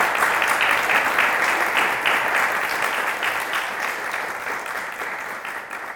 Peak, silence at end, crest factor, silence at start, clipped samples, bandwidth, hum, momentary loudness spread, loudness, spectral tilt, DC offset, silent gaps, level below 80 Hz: -4 dBFS; 0 s; 18 dB; 0 s; under 0.1%; 19 kHz; none; 10 LU; -21 LUFS; -1 dB/octave; under 0.1%; none; -62 dBFS